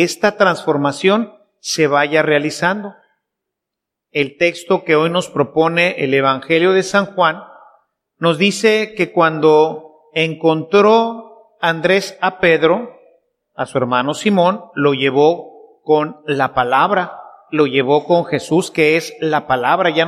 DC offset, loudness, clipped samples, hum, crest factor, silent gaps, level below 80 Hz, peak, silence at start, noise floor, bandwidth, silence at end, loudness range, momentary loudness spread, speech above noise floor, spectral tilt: under 0.1%; -15 LUFS; under 0.1%; none; 16 dB; none; -58 dBFS; 0 dBFS; 0 s; -81 dBFS; 14 kHz; 0 s; 3 LU; 8 LU; 66 dB; -5 dB/octave